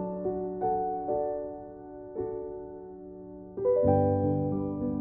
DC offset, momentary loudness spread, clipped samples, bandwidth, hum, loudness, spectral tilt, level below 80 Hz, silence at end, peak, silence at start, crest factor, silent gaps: under 0.1%; 20 LU; under 0.1%; 2.5 kHz; none; -30 LUFS; -12.5 dB/octave; -54 dBFS; 0 s; -12 dBFS; 0 s; 18 dB; none